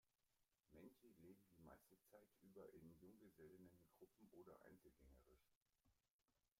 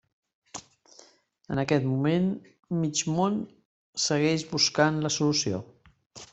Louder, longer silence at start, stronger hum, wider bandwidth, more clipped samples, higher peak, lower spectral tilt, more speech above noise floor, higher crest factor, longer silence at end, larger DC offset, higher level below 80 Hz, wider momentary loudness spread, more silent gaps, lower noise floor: second, -68 LUFS vs -26 LUFS; second, 0.05 s vs 0.55 s; neither; first, 16 kHz vs 8.2 kHz; neither; second, -52 dBFS vs -8 dBFS; first, -6.5 dB/octave vs -4.5 dB/octave; second, 21 dB vs 31 dB; second, 16 dB vs 22 dB; about the same, 0.1 s vs 0.05 s; neither; second, -84 dBFS vs -64 dBFS; second, 4 LU vs 19 LU; second, 5.56-5.66 s, 6.10-6.19 s vs 2.59-2.63 s, 3.65-3.93 s, 6.06-6.10 s; first, -89 dBFS vs -58 dBFS